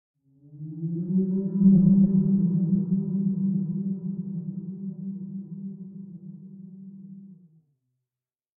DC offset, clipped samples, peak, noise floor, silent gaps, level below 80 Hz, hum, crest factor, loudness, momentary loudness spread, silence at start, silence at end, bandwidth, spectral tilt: under 0.1%; under 0.1%; -10 dBFS; under -90 dBFS; none; -58 dBFS; none; 18 dB; -24 LUFS; 25 LU; 0.5 s; 1.25 s; 1.1 kHz; -18.5 dB/octave